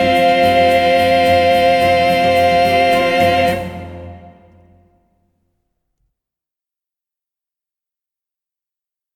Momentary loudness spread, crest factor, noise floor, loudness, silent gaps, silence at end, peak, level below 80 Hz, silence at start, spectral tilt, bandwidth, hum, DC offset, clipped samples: 12 LU; 14 dB; -87 dBFS; -12 LUFS; none; 4.85 s; -2 dBFS; -46 dBFS; 0 s; -5 dB/octave; 17 kHz; none; under 0.1%; under 0.1%